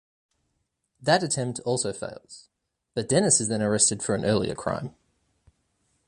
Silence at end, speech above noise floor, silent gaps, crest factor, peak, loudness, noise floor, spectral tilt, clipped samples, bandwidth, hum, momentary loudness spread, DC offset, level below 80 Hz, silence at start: 1.15 s; 51 dB; none; 22 dB; -4 dBFS; -24 LUFS; -76 dBFS; -3.5 dB/octave; under 0.1%; 11.5 kHz; none; 15 LU; under 0.1%; -58 dBFS; 1 s